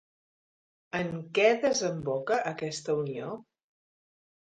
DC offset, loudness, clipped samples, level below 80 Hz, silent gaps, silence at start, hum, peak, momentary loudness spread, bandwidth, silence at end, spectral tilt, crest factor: under 0.1%; -29 LUFS; under 0.1%; -70 dBFS; none; 0.95 s; none; -10 dBFS; 13 LU; 9.4 kHz; 1.1 s; -4 dB/octave; 20 dB